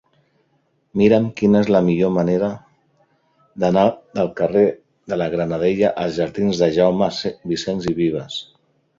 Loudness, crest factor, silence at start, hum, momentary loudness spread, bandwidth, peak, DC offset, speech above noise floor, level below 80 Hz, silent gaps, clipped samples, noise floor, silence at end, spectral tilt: -19 LUFS; 18 dB; 0.95 s; none; 10 LU; 7.6 kHz; -2 dBFS; under 0.1%; 47 dB; -52 dBFS; none; under 0.1%; -64 dBFS; 0.55 s; -7 dB/octave